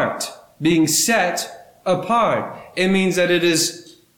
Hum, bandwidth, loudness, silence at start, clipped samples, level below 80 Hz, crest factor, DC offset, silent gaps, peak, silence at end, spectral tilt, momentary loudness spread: none; 19 kHz; -18 LUFS; 0 s; under 0.1%; -58 dBFS; 12 dB; under 0.1%; none; -6 dBFS; 0.35 s; -3.5 dB/octave; 13 LU